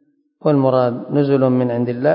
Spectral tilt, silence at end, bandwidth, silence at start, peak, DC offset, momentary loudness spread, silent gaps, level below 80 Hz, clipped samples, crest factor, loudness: -13.5 dB/octave; 0 s; 5.4 kHz; 0.45 s; -2 dBFS; under 0.1%; 4 LU; none; -64 dBFS; under 0.1%; 14 dB; -17 LUFS